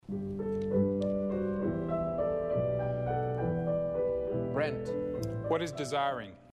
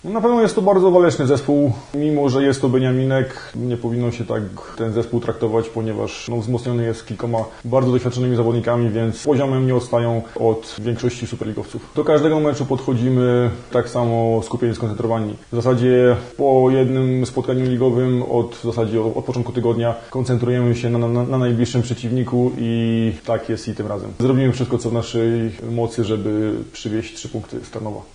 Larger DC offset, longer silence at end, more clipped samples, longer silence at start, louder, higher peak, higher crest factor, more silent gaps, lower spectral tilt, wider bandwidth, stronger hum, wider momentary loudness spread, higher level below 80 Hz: neither; about the same, 0.05 s vs 0.1 s; neither; about the same, 0.1 s vs 0.05 s; second, -33 LUFS vs -19 LUFS; second, -18 dBFS vs 0 dBFS; about the same, 14 dB vs 18 dB; neither; about the same, -7.5 dB/octave vs -7.5 dB/octave; first, 13 kHz vs 10.5 kHz; neither; second, 5 LU vs 10 LU; second, -54 dBFS vs -46 dBFS